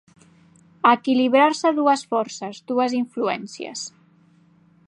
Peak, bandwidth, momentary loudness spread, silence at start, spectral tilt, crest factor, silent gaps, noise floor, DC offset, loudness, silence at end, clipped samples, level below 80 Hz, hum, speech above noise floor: -2 dBFS; 10.5 kHz; 15 LU; 0.85 s; -3.5 dB/octave; 20 dB; none; -56 dBFS; under 0.1%; -21 LUFS; 1 s; under 0.1%; -76 dBFS; 50 Hz at -60 dBFS; 35 dB